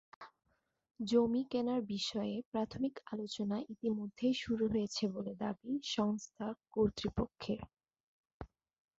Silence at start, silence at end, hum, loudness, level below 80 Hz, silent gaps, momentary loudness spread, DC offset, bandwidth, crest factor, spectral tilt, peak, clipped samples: 0.2 s; 0.55 s; none; -37 LUFS; -62 dBFS; 2.45-2.52 s, 8.00-8.24 s, 8.33-8.40 s; 14 LU; under 0.1%; 8 kHz; 18 dB; -5 dB/octave; -20 dBFS; under 0.1%